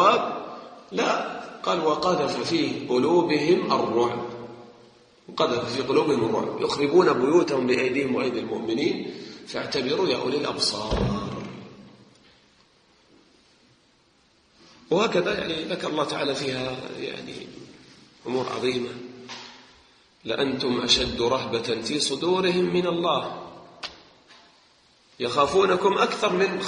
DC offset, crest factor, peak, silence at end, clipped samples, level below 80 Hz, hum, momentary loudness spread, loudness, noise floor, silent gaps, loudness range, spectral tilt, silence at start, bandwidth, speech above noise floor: under 0.1%; 20 dB; -6 dBFS; 0 s; under 0.1%; -50 dBFS; none; 18 LU; -24 LUFS; -61 dBFS; none; 8 LU; -4.5 dB/octave; 0 s; 10 kHz; 38 dB